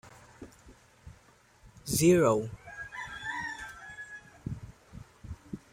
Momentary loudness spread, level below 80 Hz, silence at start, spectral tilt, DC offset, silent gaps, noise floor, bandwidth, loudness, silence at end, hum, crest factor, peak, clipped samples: 27 LU; -56 dBFS; 0.05 s; -5 dB/octave; under 0.1%; none; -61 dBFS; 16 kHz; -30 LUFS; 0.15 s; none; 22 dB; -12 dBFS; under 0.1%